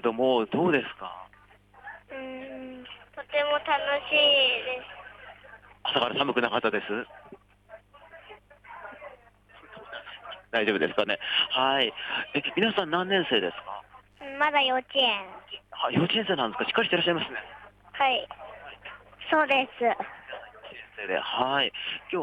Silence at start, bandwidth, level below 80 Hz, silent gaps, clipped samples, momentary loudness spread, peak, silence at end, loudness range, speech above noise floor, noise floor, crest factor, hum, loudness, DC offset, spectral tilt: 0.05 s; 9.4 kHz; -66 dBFS; none; under 0.1%; 21 LU; -10 dBFS; 0 s; 7 LU; 31 dB; -57 dBFS; 18 dB; 50 Hz at -65 dBFS; -26 LUFS; under 0.1%; -6 dB/octave